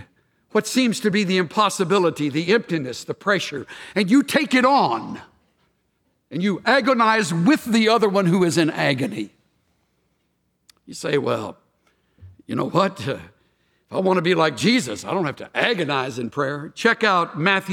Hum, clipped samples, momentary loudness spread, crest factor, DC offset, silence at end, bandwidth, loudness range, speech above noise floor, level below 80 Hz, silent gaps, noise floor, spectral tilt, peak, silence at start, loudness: none; under 0.1%; 12 LU; 18 dB; under 0.1%; 0 s; 17.5 kHz; 8 LU; 50 dB; -66 dBFS; none; -70 dBFS; -5 dB/octave; -2 dBFS; 0 s; -20 LUFS